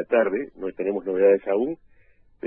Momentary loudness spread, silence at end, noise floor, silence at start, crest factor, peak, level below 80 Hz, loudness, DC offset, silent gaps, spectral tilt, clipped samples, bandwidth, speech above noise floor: 11 LU; 0 s; -57 dBFS; 0 s; 18 dB; -6 dBFS; -62 dBFS; -23 LUFS; under 0.1%; none; -10 dB/octave; under 0.1%; 3.4 kHz; 35 dB